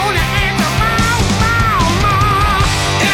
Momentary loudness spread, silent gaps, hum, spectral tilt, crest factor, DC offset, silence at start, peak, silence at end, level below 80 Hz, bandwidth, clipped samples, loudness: 2 LU; none; none; -4 dB/octave; 10 dB; under 0.1%; 0 s; -4 dBFS; 0 s; -22 dBFS; 18 kHz; under 0.1%; -13 LUFS